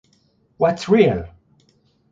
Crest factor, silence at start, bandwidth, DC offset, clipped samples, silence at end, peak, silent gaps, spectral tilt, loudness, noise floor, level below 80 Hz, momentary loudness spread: 20 dB; 0.6 s; 7.8 kHz; under 0.1%; under 0.1%; 0.85 s; -2 dBFS; none; -7 dB/octave; -18 LUFS; -61 dBFS; -46 dBFS; 14 LU